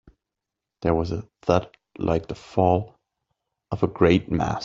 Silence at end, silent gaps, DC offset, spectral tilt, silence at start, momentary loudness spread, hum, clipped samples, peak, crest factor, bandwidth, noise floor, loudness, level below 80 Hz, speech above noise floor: 0 s; none; under 0.1%; -7.5 dB/octave; 0.8 s; 11 LU; none; under 0.1%; -2 dBFS; 22 dB; 7.6 kHz; -86 dBFS; -24 LUFS; -46 dBFS; 63 dB